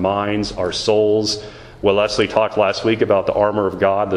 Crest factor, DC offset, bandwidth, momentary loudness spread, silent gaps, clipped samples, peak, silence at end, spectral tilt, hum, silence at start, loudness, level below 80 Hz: 18 dB; under 0.1%; 11 kHz; 6 LU; none; under 0.1%; 0 dBFS; 0 s; -5 dB/octave; none; 0 s; -18 LUFS; -44 dBFS